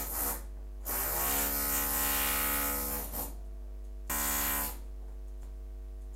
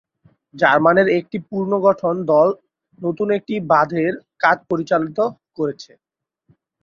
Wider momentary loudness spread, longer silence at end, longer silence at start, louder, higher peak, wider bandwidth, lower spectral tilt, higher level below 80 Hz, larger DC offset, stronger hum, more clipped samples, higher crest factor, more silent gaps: first, 18 LU vs 11 LU; second, 0 s vs 1 s; second, 0 s vs 0.55 s; second, -31 LUFS vs -18 LUFS; second, -18 dBFS vs 0 dBFS; first, 16 kHz vs 7 kHz; second, -2 dB/octave vs -7 dB/octave; first, -42 dBFS vs -62 dBFS; neither; neither; neither; about the same, 16 dB vs 18 dB; neither